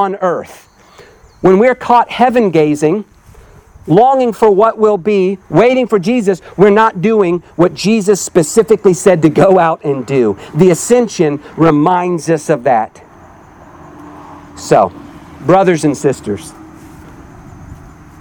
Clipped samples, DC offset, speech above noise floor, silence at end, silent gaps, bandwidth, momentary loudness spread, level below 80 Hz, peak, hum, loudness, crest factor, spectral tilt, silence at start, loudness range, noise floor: 0.2%; under 0.1%; 30 dB; 0.3 s; none; 20 kHz; 7 LU; -46 dBFS; 0 dBFS; none; -11 LUFS; 12 dB; -6 dB/octave; 0 s; 5 LU; -41 dBFS